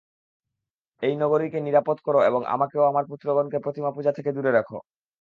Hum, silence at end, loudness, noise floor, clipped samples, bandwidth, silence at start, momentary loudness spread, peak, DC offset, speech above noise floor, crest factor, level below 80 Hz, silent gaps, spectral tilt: none; 0.4 s; -24 LUFS; -85 dBFS; under 0.1%; 5 kHz; 1 s; 7 LU; -8 dBFS; under 0.1%; 62 dB; 18 dB; -72 dBFS; none; -8.5 dB/octave